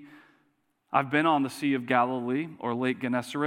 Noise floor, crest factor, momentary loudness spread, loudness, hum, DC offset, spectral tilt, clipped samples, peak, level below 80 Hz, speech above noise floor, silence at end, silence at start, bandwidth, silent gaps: -71 dBFS; 22 dB; 6 LU; -27 LUFS; none; under 0.1%; -6 dB/octave; under 0.1%; -6 dBFS; -84 dBFS; 45 dB; 0 s; 0 s; 15.5 kHz; none